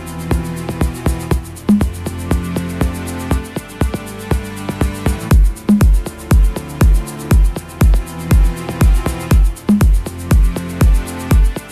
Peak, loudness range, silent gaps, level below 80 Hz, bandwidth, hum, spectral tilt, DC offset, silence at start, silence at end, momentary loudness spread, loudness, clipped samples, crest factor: -2 dBFS; 4 LU; none; -16 dBFS; 14 kHz; none; -6.5 dB/octave; under 0.1%; 0 s; 0 s; 7 LU; -16 LUFS; under 0.1%; 12 dB